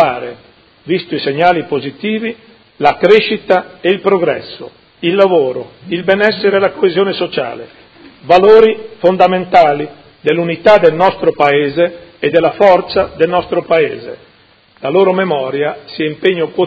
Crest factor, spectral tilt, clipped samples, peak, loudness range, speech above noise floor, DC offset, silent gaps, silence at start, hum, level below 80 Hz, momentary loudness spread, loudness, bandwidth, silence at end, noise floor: 12 dB; -7 dB/octave; 0.5%; 0 dBFS; 4 LU; 36 dB; under 0.1%; none; 0 s; none; -50 dBFS; 11 LU; -12 LUFS; 8 kHz; 0 s; -48 dBFS